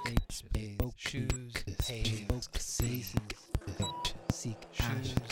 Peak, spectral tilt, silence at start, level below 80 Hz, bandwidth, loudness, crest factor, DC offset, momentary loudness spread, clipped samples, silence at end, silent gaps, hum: -14 dBFS; -4.5 dB/octave; 0 s; -42 dBFS; 17 kHz; -37 LUFS; 22 dB; under 0.1%; 5 LU; under 0.1%; 0 s; none; none